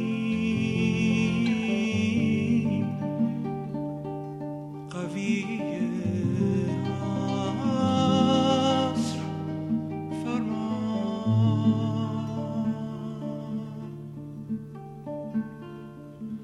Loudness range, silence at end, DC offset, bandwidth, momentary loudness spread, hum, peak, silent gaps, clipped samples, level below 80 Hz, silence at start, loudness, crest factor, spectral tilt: 8 LU; 0 s; under 0.1%; 11 kHz; 15 LU; none; -10 dBFS; none; under 0.1%; -58 dBFS; 0 s; -27 LUFS; 16 dB; -7 dB/octave